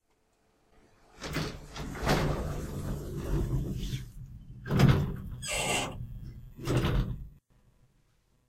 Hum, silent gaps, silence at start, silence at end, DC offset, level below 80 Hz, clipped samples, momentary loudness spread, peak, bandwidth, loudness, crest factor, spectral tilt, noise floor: none; none; 1.15 s; 1.15 s; under 0.1%; -40 dBFS; under 0.1%; 19 LU; -10 dBFS; 16 kHz; -32 LUFS; 24 dB; -5.5 dB/octave; -71 dBFS